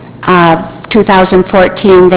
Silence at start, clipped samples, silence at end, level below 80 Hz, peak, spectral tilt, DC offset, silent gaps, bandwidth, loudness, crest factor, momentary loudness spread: 0 s; 4%; 0 s; -34 dBFS; 0 dBFS; -10.5 dB/octave; under 0.1%; none; 4 kHz; -7 LUFS; 6 dB; 5 LU